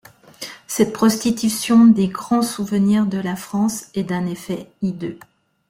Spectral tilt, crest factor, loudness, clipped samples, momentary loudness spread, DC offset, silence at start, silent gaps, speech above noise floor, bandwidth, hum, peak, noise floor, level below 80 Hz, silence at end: -5.5 dB/octave; 16 dB; -19 LUFS; under 0.1%; 16 LU; under 0.1%; 0.4 s; none; 19 dB; 16 kHz; none; -4 dBFS; -37 dBFS; -56 dBFS; 0.5 s